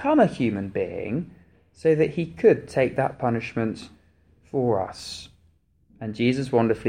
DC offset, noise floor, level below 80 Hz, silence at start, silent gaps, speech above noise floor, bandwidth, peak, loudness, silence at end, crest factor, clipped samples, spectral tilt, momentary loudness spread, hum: under 0.1%; -62 dBFS; -56 dBFS; 0 s; none; 39 dB; 10.5 kHz; -6 dBFS; -24 LUFS; 0 s; 18 dB; under 0.1%; -7 dB/octave; 15 LU; none